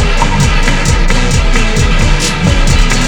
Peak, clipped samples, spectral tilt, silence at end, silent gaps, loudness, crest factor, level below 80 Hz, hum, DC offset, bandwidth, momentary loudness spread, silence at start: 0 dBFS; 0.3%; -4 dB/octave; 0 s; none; -11 LUFS; 8 dB; -10 dBFS; none; under 0.1%; 12 kHz; 1 LU; 0 s